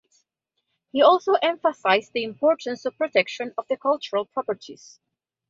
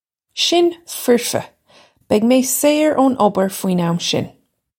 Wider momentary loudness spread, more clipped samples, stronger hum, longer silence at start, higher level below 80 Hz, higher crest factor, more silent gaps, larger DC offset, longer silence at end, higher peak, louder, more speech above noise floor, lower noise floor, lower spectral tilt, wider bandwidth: first, 13 LU vs 9 LU; neither; neither; first, 0.95 s vs 0.35 s; second, -72 dBFS vs -62 dBFS; about the same, 20 dB vs 16 dB; neither; neither; first, 0.75 s vs 0.5 s; about the same, -4 dBFS vs -2 dBFS; second, -23 LUFS vs -16 LUFS; first, 56 dB vs 35 dB; first, -79 dBFS vs -51 dBFS; about the same, -4 dB/octave vs -4 dB/octave; second, 7.6 kHz vs 17 kHz